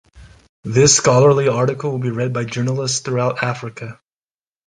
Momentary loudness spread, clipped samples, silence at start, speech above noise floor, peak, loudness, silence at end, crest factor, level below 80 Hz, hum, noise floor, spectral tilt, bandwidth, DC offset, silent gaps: 18 LU; under 0.1%; 0.15 s; over 73 dB; 0 dBFS; -16 LUFS; 0.75 s; 18 dB; -50 dBFS; none; under -90 dBFS; -4 dB/octave; 9.6 kHz; under 0.1%; 0.49-0.63 s